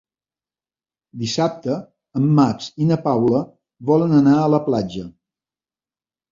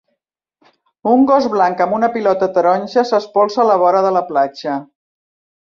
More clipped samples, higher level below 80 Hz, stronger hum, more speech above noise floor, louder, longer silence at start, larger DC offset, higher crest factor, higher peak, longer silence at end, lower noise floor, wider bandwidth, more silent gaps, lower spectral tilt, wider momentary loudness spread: neither; first, -56 dBFS vs -62 dBFS; neither; first, over 72 dB vs 60 dB; second, -19 LUFS vs -15 LUFS; about the same, 1.15 s vs 1.05 s; neither; about the same, 18 dB vs 14 dB; about the same, -2 dBFS vs -2 dBFS; first, 1.2 s vs 0.75 s; first, under -90 dBFS vs -74 dBFS; about the same, 7.6 kHz vs 7.2 kHz; neither; first, -7.5 dB/octave vs -6 dB/octave; first, 15 LU vs 7 LU